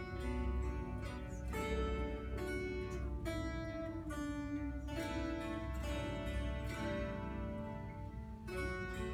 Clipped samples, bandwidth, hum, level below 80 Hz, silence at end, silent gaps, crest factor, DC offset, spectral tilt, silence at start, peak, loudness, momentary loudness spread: under 0.1%; 14 kHz; none; -46 dBFS; 0 s; none; 14 dB; under 0.1%; -6.5 dB/octave; 0 s; -28 dBFS; -42 LUFS; 5 LU